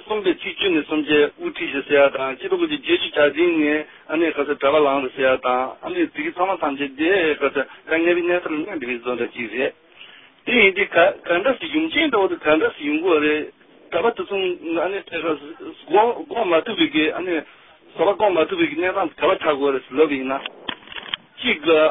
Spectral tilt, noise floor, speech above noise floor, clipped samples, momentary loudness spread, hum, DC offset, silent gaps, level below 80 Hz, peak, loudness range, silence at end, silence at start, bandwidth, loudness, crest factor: -9 dB/octave; -45 dBFS; 26 dB; under 0.1%; 9 LU; none; under 0.1%; none; -58 dBFS; -2 dBFS; 3 LU; 0 s; 0.05 s; 3.9 kHz; -20 LUFS; 20 dB